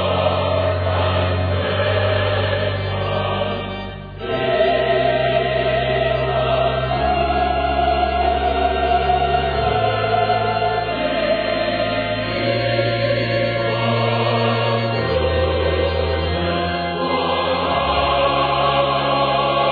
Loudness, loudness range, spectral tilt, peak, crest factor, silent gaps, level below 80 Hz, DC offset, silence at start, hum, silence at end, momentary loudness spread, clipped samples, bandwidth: -19 LUFS; 2 LU; -8.5 dB/octave; -6 dBFS; 14 dB; none; -34 dBFS; under 0.1%; 0 s; none; 0 s; 4 LU; under 0.1%; 5 kHz